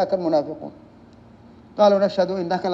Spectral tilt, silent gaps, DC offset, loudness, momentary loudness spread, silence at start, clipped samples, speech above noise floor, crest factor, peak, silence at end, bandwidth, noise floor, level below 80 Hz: -7 dB/octave; none; under 0.1%; -20 LUFS; 20 LU; 0 s; under 0.1%; 27 dB; 18 dB; -4 dBFS; 0 s; 7.4 kHz; -48 dBFS; -60 dBFS